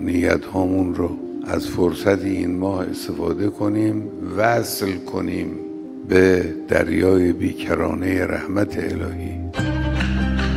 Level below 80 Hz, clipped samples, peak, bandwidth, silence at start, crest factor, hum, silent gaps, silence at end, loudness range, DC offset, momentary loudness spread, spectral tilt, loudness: -34 dBFS; under 0.1%; -2 dBFS; 16 kHz; 0 s; 20 dB; none; none; 0 s; 3 LU; under 0.1%; 10 LU; -6.5 dB/octave; -21 LUFS